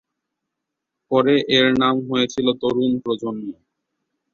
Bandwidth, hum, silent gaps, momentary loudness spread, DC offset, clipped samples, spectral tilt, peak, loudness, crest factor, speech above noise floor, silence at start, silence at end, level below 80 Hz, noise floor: 7.2 kHz; none; none; 11 LU; under 0.1%; under 0.1%; -5 dB/octave; -4 dBFS; -19 LUFS; 18 dB; 62 dB; 1.1 s; 0.8 s; -58 dBFS; -81 dBFS